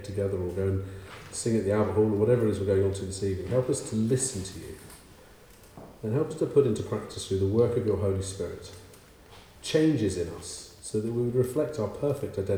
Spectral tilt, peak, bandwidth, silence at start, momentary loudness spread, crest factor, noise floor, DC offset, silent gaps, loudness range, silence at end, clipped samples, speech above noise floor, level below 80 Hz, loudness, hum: -6 dB/octave; -10 dBFS; over 20 kHz; 0 s; 15 LU; 18 dB; -52 dBFS; under 0.1%; none; 4 LU; 0 s; under 0.1%; 25 dB; -54 dBFS; -28 LUFS; none